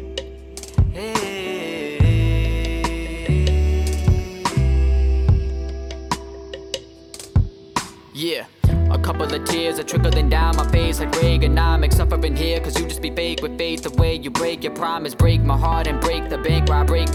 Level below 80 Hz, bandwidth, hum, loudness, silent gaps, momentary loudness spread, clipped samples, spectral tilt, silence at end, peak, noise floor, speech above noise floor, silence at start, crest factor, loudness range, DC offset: -22 dBFS; 15.5 kHz; none; -20 LUFS; none; 10 LU; under 0.1%; -5.5 dB/octave; 0 s; -6 dBFS; -39 dBFS; 21 dB; 0 s; 12 dB; 5 LU; under 0.1%